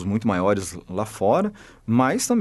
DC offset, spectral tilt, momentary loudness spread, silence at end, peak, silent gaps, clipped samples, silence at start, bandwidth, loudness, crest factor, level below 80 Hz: under 0.1%; -5.5 dB/octave; 10 LU; 0 s; -6 dBFS; none; under 0.1%; 0 s; 12 kHz; -23 LUFS; 16 dB; -54 dBFS